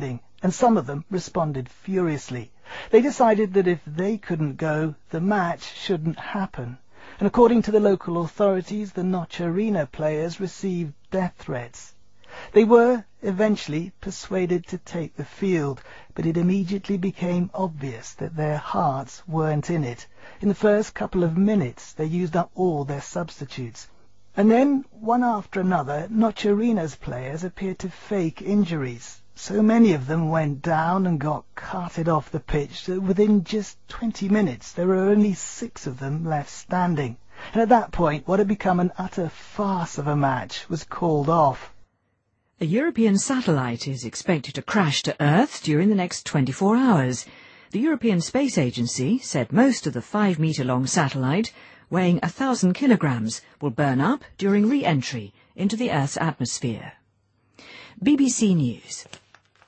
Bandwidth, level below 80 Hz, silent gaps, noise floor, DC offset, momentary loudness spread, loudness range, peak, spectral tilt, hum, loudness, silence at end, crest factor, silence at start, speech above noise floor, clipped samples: 8.8 kHz; -50 dBFS; none; -71 dBFS; under 0.1%; 13 LU; 4 LU; -2 dBFS; -6 dB/octave; none; -23 LUFS; 0.5 s; 20 dB; 0 s; 48 dB; under 0.1%